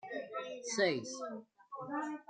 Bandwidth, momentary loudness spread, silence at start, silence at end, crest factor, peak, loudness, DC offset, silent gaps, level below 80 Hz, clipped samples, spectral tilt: 9.4 kHz; 16 LU; 0.05 s; 0.05 s; 22 dB; -18 dBFS; -38 LUFS; under 0.1%; none; -88 dBFS; under 0.1%; -3 dB/octave